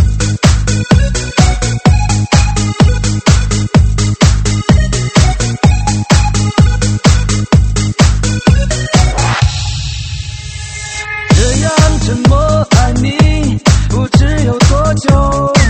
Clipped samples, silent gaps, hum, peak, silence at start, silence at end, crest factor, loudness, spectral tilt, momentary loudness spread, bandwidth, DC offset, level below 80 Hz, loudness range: 0.4%; none; none; 0 dBFS; 0 s; 0 s; 10 dB; -11 LUFS; -5 dB/octave; 4 LU; 8.8 kHz; under 0.1%; -16 dBFS; 3 LU